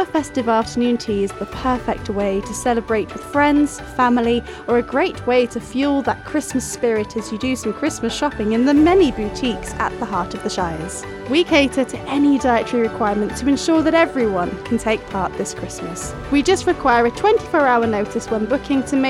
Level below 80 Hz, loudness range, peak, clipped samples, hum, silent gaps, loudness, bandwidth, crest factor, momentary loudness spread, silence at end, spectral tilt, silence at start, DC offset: -40 dBFS; 2 LU; -2 dBFS; under 0.1%; none; none; -19 LUFS; 13.5 kHz; 16 dB; 8 LU; 0 s; -4.5 dB/octave; 0 s; under 0.1%